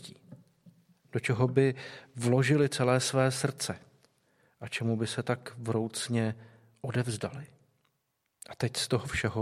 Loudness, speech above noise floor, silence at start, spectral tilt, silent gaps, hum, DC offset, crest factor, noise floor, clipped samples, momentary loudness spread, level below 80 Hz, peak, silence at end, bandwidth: -30 LUFS; 50 dB; 0 s; -5 dB/octave; none; none; under 0.1%; 20 dB; -79 dBFS; under 0.1%; 16 LU; -60 dBFS; -10 dBFS; 0 s; 14 kHz